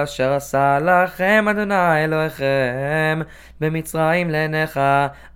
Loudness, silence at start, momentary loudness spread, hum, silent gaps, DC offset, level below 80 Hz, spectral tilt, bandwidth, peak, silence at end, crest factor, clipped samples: -18 LUFS; 0 s; 6 LU; none; none; under 0.1%; -48 dBFS; -6 dB/octave; 17 kHz; -2 dBFS; 0.05 s; 16 dB; under 0.1%